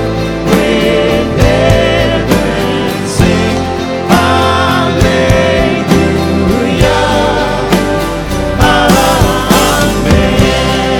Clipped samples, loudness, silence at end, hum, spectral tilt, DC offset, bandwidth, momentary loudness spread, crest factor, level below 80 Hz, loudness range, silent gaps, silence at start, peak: 0.6%; -10 LUFS; 0 s; none; -5 dB/octave; under 0.1%; 20 kHz; 6 LU; 10 dB; -22 dBFS; 1 LU; none; 0 s; 0 dBFS